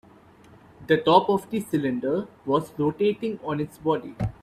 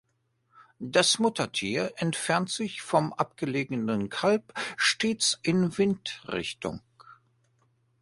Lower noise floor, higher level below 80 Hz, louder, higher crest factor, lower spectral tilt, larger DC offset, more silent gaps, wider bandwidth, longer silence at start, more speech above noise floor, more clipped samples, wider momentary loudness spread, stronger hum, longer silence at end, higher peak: second, -52 dBFS vs -73 dBFS; first, -52 dBFS vs -64 dBFS; about the same, -25 LUFS vs -27 LUFS; about the same, 22 dB vs 22 dB; first, -7 dB/octave vs -3.5 dB/octave; neither; neither; first, 14.5 kHz vs 11.5 kHz; first, 0.8 s vs 0.6 s; second, 28 dB vs 46 dB; neither; about the same, 10 LU vs 10 LU; neither; second, 0.1 s vs 0.9 s; first, -4 dBFS vs -8 dBFS